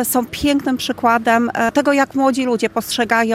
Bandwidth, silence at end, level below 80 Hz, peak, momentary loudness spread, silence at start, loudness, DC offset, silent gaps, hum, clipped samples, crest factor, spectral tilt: 16 kHz; 0 s; -46 dBFS; -2 dBFS; 4 LU; 0 s; -17 LUFS; under 0.1%; none; none; under 0.1%; 14 dB; -3.5 dB/octave